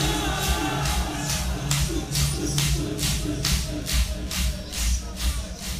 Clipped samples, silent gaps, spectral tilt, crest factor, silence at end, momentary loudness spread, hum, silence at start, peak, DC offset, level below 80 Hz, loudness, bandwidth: under 0.1%; none; -3.5 dB/octave; 20 dB; 0 s; 4 LU; none; 0 s; -6 dBFS; under 0.1%; -30 dBFS; -25 LUFS; 16 kHz